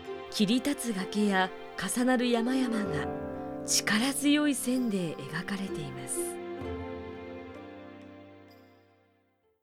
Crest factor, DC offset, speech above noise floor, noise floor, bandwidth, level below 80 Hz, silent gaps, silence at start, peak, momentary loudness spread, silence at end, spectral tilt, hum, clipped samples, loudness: 18 dB; under 0.1%; 42 dB; -71 dBFS; 16.5 kHz; -60 dBFS; none; 0 s; -14 dBFS; 17 LU; 1.05 s; -3.5 dB/octave; none; under 0.1%; -30 LUFS